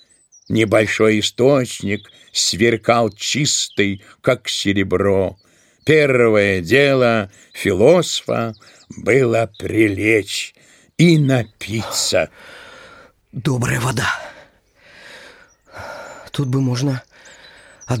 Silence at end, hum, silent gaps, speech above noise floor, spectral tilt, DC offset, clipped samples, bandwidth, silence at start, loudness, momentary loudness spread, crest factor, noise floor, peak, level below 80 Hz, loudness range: 0 s; none; none; 34 dB; -4.5 dB/octave; under 0.1%; under 0.1%; 16.5 kHz; 0.5 s; -17 LUFS; 13 LU; 18 dB; -51 dBFS; 0 dBFS; -52 dBFS; 9 LU